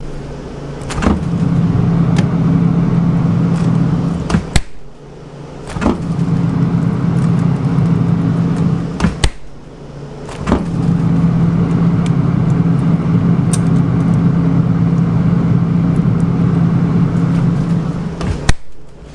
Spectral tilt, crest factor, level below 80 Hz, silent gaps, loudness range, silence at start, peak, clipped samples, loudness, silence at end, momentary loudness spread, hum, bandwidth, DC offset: -7.5 dB/octave; 14 dB; -28 dBFS; none; 4 LU; 0 s; 0 dBFS; under 0.1%; -14 LUFS; 0 s; 13 LU; none; 11 kHz; under 0.1%